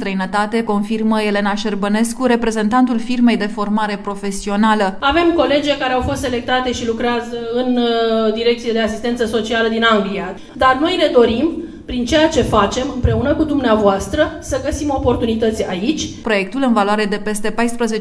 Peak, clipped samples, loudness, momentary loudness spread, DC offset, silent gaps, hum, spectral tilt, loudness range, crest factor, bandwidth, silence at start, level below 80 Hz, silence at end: 0 dBFS; under 0.1%; -16 LUFS; 7 LU; under 0.1%; none; none; -5 dB/octave; 2 LU; 16 dB; 11 kHz; 0 s; -34 dBFS; 0 s